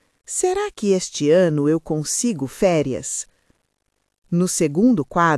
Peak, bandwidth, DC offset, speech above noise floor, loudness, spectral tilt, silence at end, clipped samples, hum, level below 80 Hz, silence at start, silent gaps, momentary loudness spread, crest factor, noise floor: -4 dBFS; 12 kHz; under 0.1%; 53 dB; -20 LUFS; -5 dB/octave; 0 s; under 0.1%; none; -52 dBFS; 0.3 s; 4.18-4.22 s; 9 LU; 16 dB; -72 dBFS